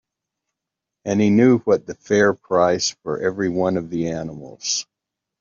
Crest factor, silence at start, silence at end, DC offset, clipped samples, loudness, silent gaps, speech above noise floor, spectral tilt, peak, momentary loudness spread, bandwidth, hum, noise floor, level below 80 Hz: 18 dB; 1.05 s; 0.6 s; under 0.1%; under 0.1%; -20 LUFS; none; 65 dB; -5 dB/octave; -4 dBFS; 11 LU; 7.6 kHz; none; -84 dBFS; -60 dBFS